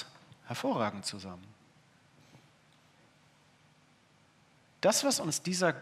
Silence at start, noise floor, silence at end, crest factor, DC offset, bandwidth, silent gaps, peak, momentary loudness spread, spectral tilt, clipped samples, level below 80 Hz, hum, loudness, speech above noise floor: 0 s; -65 dBFS; 0 s; 24 dB; under 0.1%; 15.5 kHz; none; -12 dBFS; 20 LU; -3 dB/octave; under 0.1%; -84 dBFS; none; -32 LUFS; 33 dB